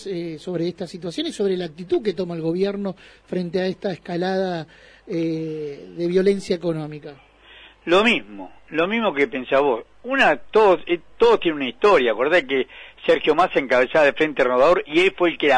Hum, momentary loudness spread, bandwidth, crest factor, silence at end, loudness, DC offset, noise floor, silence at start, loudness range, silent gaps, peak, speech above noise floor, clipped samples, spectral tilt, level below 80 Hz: none; 13 LU; 10.5 kHz; 14 dB; 0 s; -20 LUFS; under 0.1%; -48 dBFS; 0 s; 7 LU; none; -6 dBFS; 27 dB; under 0.1%; -5.5 dB/octave; -54 dBFS